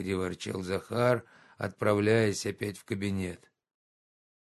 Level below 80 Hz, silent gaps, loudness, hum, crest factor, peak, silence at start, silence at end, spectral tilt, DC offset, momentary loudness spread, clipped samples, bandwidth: -56 dBFS; none; -31 LUFS; none; 20 dB; -10 dBFS; 0 s; 1.1 s; -5.5 dB/octave; under 0.1%; 13 LU; under 0.1%; 12.5 kHz